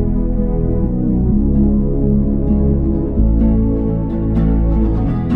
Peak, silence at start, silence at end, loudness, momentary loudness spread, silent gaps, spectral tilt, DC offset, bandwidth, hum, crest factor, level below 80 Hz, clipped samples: -2 dBFS; 0 s; 0 s; -16 LUFS; 4 LU; none; -12.5 dB/octave; 0.5%; 3 kHz; none; 12 dB; -18 dBFS; under 0.1%